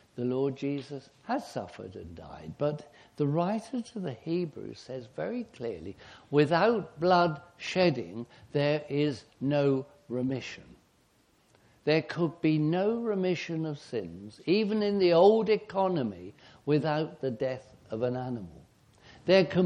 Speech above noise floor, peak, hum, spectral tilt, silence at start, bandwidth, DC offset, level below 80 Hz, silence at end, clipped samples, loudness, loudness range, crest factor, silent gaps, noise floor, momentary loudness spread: 37 dB; -10 dBFS; none; -7 dB/octave; 0.15 s; 10 kHz; under 0.1%; -66 dBFS; 0 s; under 0.1%; -29 LUFS; 7 LU; 20 dB; none; -67 dBFS; 18 LU